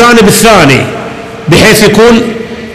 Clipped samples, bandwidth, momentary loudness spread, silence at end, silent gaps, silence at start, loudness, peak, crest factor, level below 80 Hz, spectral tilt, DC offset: 9%; 16.5 kHz; 16 LU; 0 s; none; 0 s; -4 LUFS; 0 dBFS; 4 dB; -28 dBFS; -4 dB/octave; under 0.1%